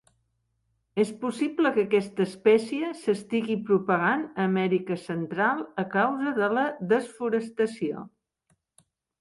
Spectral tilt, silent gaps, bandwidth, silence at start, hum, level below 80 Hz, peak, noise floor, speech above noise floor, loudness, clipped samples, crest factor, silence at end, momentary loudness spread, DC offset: -6.5 dB/octave; none; 11.5 kHz; 0.95 s; none; -72 dBFS; -8 dBFS; -74 dBFS; 49 dB; -26 LUFS; under 0.1%; 18 dB; 1.1 s; 8 LU; under 0.1%